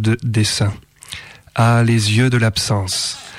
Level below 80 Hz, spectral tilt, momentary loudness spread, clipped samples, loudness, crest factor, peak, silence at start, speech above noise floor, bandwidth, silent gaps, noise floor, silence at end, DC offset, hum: -46 dBFS; -5 dB/octave; 18 LU; under 0.1%; -16 LUFS; 10 dB; -6 dBFS; 0 s; 20 dB; 14.5 kHz; none; -35 dBFS; 0 s; under 0.1%; none